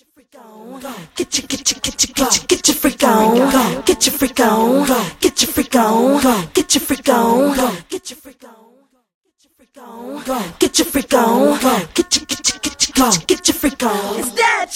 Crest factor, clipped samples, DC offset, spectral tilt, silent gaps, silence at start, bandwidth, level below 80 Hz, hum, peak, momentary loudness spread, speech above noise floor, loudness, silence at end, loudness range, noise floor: 16 dB; under 0.1%; under 0.1%; -2.5 dB/octave; 9.14-9.21 s; 0.55 s; 16.5 kHz; -44 dBFS; none; 0 dBFS; 12 LU; 41 dB; -15 LUFS; 0 s; 6 LU; -56 dBFS